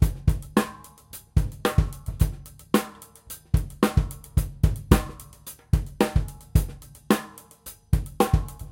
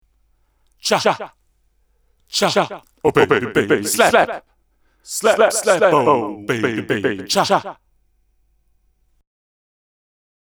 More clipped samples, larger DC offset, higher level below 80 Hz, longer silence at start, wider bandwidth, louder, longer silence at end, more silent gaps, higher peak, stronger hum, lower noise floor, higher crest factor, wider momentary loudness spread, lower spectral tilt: neither; neither; first, -30 dBFS vs -56 dBFS; second, 0 s vs 0.85 s; second, 17 kHz vs over 20 kHz; second, -26 LUFS vs -17 LUFS; second, 0.05 s vs 2.7 s; neither; about the same, -2 dBFS vs 0 dBFS; neither; second, -47 dBFS vs -61 dBFS; about the same, 22 dB vs 20 dB; first, 19 LU vs 11 LU; first, -6.5 dB/octave vs -3.5 dB/octave